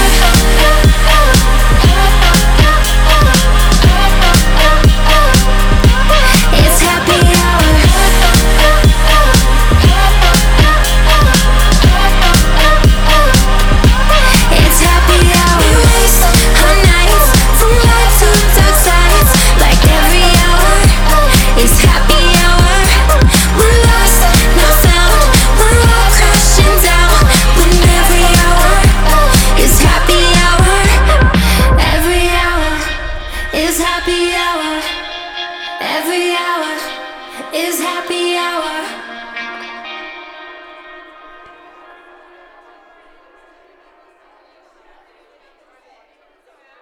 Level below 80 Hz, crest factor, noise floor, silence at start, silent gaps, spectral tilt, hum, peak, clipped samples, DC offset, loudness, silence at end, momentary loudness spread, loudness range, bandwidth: -10 dBFS; 8 dB; -53 dBFS; 0 s; none; -3.5 dB/octave; none; 0 dBFS; under 0.1%; under 0.1%; -9 LUFS; 6.3 s; 10 LU; 10 LU; over 20 kHz